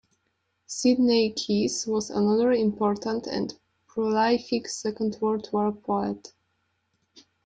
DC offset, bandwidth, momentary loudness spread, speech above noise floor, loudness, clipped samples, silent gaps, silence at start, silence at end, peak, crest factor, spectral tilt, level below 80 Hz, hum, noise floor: under 0.1%; 9.2 kHz; 10 LU; 50 dB; -25 LUFS; under 0.1%; none; 0.7 s; 1.2 s; -10 dBFS; 16 dB; -4.5 dB/octave; -66 dBFS; none; -75 dBFS